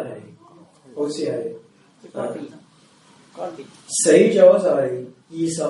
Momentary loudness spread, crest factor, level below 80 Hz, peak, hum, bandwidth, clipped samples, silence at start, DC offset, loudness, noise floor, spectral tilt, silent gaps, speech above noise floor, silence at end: 24 LU; 20 dB; -70 dBFS; 0 dBFS; none; 11.5 kHz; under 0.1%; 0 s; under 0.1%; -18 LUFS; -53 dBFS; -4.5 dB/octave; none; 34 dB; 0 s